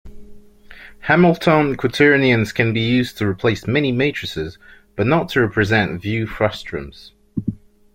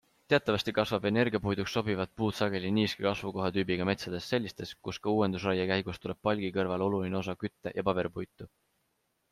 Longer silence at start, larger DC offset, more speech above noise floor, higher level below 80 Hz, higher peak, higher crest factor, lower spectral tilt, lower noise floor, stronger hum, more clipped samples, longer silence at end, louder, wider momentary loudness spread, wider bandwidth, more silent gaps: second, 0.05 s vs 0.3 s; neither; second, 24 dB vs 46 dB; first, -44 dBFS vs -62 dBFS; first, 0 dBFS vs -12 dBFS; about the same, 18 dB vs 20 dB; about the same, -6.5 dB/octave vs -6 dB/octave; second, -41 dBFS vs -77 dBFS; neither; neither; second, 0.4 s vs 0.85 s; first, -18 LUFS vs -31 LUFS; first, 16 LU vs 9 LU; first, 16.5 kHz vs 14.5 kHz; neither